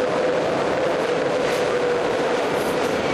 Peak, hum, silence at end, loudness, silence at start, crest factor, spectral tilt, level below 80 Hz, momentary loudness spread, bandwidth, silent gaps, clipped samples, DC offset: -10 dBFS; none; 0 s; -21 LUFS; 0 s; 10 dB; -4.5 dB/octave; -52 dBFS; 1 LU; 14 kHz; none; under 0.1%; under 0.1%